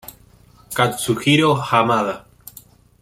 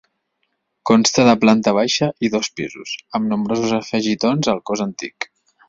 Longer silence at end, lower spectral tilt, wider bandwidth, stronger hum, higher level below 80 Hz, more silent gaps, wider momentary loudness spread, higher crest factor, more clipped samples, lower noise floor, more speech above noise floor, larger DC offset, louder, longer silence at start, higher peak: first, 0.8 s vs 0.45 s; about the same, -4.5 dB/octave vs -4.5 dB/octave; first, 16.5 kHz vs 7.6 kHz; neither; about the same, -54 dBFS vs -56 dBFS; neither; second, 11 LU vs 15 LU; about the same, 18 dB vs 18 dB; neither; second, -50 dBFS vs -71 dBFS; second, 32 dB vs 54 dB; neither; about the same, -18 LUFS vs -18 LUFS; second, 0.05 s vs 0.85 s; about the same, -2 dBFS vs -2 dBFS